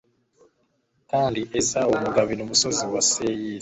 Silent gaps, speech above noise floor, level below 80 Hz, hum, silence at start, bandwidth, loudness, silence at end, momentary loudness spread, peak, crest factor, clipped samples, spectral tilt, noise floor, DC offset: none; 46 dB; -56 dBFS; none; 1.15 s; 8.4 kHz; -22 LUFS; 0 s; 4 LU; -4 dBFS; 20 dB; under 0.1%; -2.5 dB/octave; -69 dBFS; under 0.1%